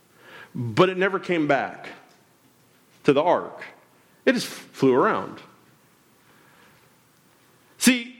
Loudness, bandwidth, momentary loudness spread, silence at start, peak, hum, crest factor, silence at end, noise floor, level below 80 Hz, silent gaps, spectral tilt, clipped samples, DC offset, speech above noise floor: -23 LUFS; 17 kHz; 21 LU; 0.3 s; -4 dBFS; none; 20 dB; 0.1 s; -59 dBFS; -70 dBFS; none; -4.5 dB/octave; under 0.1%; under 0.1%; 37 dB